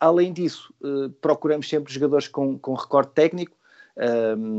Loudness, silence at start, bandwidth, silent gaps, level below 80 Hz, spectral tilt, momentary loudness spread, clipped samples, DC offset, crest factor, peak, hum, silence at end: -23 LUFS; 0 s; 8 kHz; none; -74 dBFS; -6.5 dB/octave; 8 LU; under 0.1%; under 0.1%; 18 dB; -4 dBFS; none; 0 s